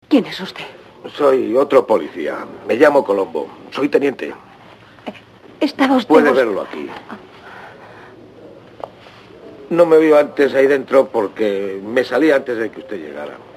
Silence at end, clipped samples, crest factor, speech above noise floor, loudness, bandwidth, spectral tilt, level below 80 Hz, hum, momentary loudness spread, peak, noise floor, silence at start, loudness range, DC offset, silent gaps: 0.2 s; under 0.1%; 18 dB; 27 dB; -16 LUFS; 14 kHz; -5.5 dB/octave; -62 dBFS; none; 22 LU; 0 dBFS; -43 dBFS; 0.1 s; 5 LU; under 0.1%; none